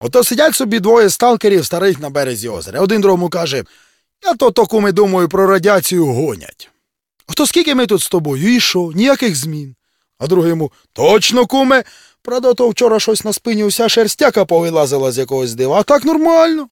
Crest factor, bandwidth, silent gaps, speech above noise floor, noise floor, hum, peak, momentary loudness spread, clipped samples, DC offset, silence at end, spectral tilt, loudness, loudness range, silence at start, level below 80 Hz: 14 dB; 17.5 kHz; none; 49 dB; -62 dBFS; none; 0 dBFS; 9 LU; under 0.1%; under 0.1%; 0.05 s; -4 dB/octave; -13 LUFS; 2 LU; 0 s; -52 dBFS